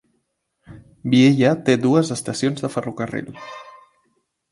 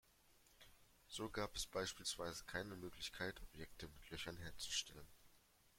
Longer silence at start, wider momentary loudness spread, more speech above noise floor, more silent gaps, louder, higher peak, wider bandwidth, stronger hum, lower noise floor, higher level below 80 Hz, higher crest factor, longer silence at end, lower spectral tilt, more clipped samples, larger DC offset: first, 0.7 s vs 0.05 s; about the same, 21 LU vs 20 LU; first, 53 dB vs 24 dB; neither; first, -19 LUFS vs -48 LUFS; first, -2 dBFS vs -28 dBFS; second, 11.5 kHz vs 16.5 kHz; neither; about the same, -71 dBFS vs -73 dBFS; about the same, -60 dBFS vs -64 dBFS; about the same, 20 dB vs 22 dB; first, 0.8 s vs 0 s; first, -6 dB/octave vs -2.5 dB/octave; neither; neither